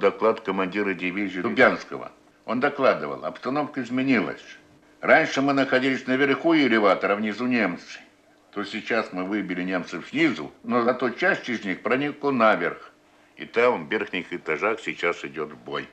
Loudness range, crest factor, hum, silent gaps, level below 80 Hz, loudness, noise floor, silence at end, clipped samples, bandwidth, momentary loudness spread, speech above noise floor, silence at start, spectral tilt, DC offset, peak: 5 LU; 20 dB; none; none; -68 dBFS; -24 LUFS; -56 dBFS; 0.05 s; under 0.1%; 8.6 kHz; 14 LU; 32 dB; 0 s; -5.5 dB/octave; under 0.1%; -4 dBFS